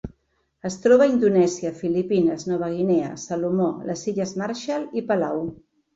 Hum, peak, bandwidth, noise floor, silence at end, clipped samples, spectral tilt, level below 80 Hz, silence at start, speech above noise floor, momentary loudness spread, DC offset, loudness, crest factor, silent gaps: none; -6 dBFS; 8 kHz; -69 dBFS; 0.4 s; under 0.1%; -6 dB/octave; -56 dBFS; 0.05 s; 47 dB; 11 LU; under 0.1%; -22 LUFS; 18 dB; none